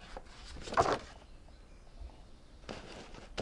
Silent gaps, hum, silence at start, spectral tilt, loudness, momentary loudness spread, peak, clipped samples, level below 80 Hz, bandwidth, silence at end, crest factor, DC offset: none; none; 0 s; -4.5 dB/octave; -37 LUFS; 27 LU; -14 dBFS; under 0.1%; -52 dBFS; 11.5 kHz; 0 s; 26 dB; under 0.1%